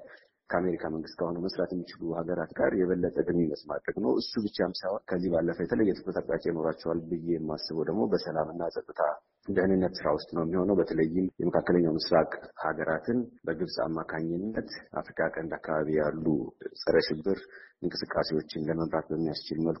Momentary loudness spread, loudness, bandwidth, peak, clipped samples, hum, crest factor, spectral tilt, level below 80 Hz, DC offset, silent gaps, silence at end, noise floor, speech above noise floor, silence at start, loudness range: 8 LU; -30 LUFS; 6 kHz; -12 dBFS; under 0.1%; none; 18 dB; -5 dB/octave; -58 dBFS; under 0.1%; none; 0 s; -54 dBFS; 24 dB; 0 s; 4 LU